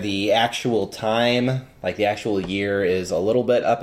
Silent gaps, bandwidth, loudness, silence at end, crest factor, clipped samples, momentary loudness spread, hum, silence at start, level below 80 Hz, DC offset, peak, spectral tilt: none; 15.5 kHz; -21 LUFS; 0 s; 16 dB; under 0.1%; 5 LU; none; 0 s; -54 dBFS; under 0.1%; -4 dBFS; -5 dB/octave